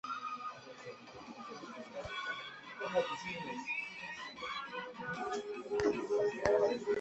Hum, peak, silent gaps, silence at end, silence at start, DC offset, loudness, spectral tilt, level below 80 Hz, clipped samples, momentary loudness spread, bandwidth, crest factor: none; -14 dBFS; none; 0 s; 0.05 s; under 0.1%; -38 LUFS; -4 dB/octave; -66 dBFS; under 0.1%; 16 LU; 8.2 kHz; 24 dB